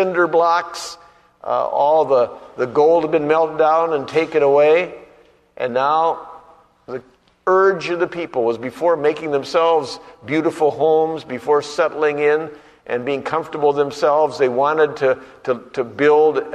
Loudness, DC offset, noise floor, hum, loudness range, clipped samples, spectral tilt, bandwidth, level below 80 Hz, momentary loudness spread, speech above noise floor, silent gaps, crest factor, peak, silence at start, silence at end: -18 LUFS; under 0.1%; -51 dBFS; none; 3 LU; under 0.1%; -5.5 dB/octave; 10.5 kHz; -62 dBFS; 12 LU; 34 dB; none; 14 dB; -4 dBFS; 0 s; 0 s